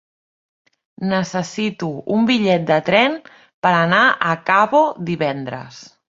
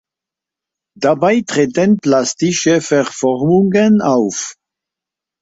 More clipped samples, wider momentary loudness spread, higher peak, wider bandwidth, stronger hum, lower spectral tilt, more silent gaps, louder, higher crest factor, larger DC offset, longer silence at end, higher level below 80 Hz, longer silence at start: neither; first, 13 LU vs 6 LU; about the same, -2 dBFS vs -2 dBFS; about the same, 7.8 kHz vs 8 kHz; neither; about the same, -5.5 dB/octave vs -5 dB/octave; first, 3.54-3.62 s vs none; second, -17 LUFS vs -14 LUFS; about the same, 18 dB vs 14 dB; neither; second, 0.25 s vs 0.9 s; about the same, -60 dBFS vs -56 dBFS; about the same, 1 s vs 1 s